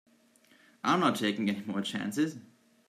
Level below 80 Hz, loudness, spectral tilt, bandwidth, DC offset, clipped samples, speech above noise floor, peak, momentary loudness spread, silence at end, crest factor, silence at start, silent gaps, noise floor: -76 dBFS; -31 LUFS; -5 dB/octave; 15.5 kHz; under 0.1%; under 0.1%; 34 dB; -12 dBFS; 8 LU; 0.45 s; 20 dB; 0.85 s; none; -64 dBFS